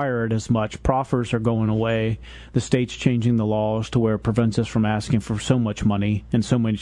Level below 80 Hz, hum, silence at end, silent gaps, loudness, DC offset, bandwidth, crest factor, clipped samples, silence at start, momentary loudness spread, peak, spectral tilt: -42 dBFS; none; 0 s; none; -22 LUFS; under 0.1%; 11 kHz; 16 dB; under 0.1%; 0 s; 3 LU; -4 dBFS; -7 dB/octave